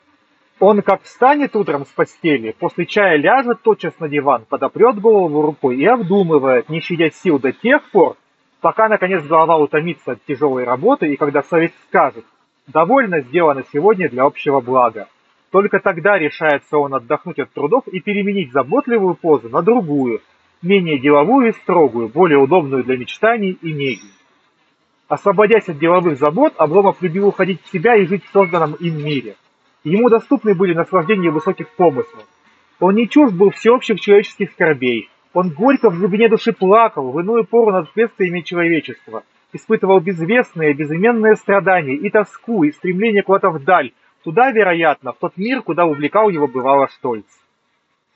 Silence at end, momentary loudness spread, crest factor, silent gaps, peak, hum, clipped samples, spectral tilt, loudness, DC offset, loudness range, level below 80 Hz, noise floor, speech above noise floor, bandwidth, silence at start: 0.95 s; 9 LU; 14 dB; none; 0 dBFS; none; under 0.1%; -7.5 dB/octave; -15 LUFS; under 0.1%; 3 LU; -66 dBFS; -65 dBFS; 51 dB; 7.8 kHz; 0.6 s